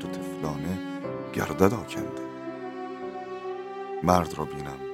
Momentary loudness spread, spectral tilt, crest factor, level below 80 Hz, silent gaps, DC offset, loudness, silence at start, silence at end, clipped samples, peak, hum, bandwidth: 13 LU; -6.5 dB/octave; 28 dB; -54 dBFS; none; under 0.1%; -30 LUFS; 0 s; 0 s; under 0.1%; -2 dBFS; none; 16 kHz